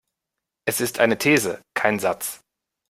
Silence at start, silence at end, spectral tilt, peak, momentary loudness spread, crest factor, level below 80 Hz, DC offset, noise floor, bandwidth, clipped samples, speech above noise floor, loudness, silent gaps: 0.65 s; 0.55 s; -3.5 dB/octave; -2 dBFS; 11 LU; 22 dB; -62 dBFS; under 0.1%; -84 dBFS; 16 kHz; under 0.1%; 63 dB; -22 LUFS; none